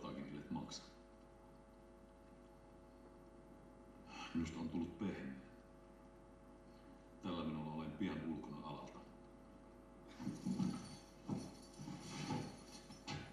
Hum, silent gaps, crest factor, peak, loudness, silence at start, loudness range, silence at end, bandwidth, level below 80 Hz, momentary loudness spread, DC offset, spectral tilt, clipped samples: none; none; 20 dB; -30 dBFS; -48 LUFS; 0 s; 7 LU; 0 s; 13 kHz; -68 dBFS; 18 LU; under 0.1%; -6 dB/octave; under 0.1%